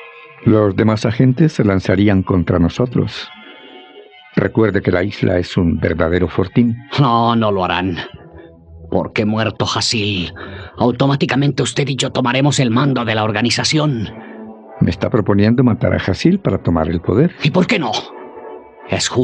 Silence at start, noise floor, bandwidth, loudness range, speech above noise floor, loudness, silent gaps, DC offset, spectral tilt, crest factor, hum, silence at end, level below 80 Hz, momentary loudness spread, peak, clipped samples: 0 s; -41 dBFS; 10.5 kHz; 3 LU; 26 dB; -16 LUFS; none; under 0.1%; -6 dB/octave; 16 dB; none; 0 s; -44 dBFS; 13 LU; 0 dBFS; under 0.1%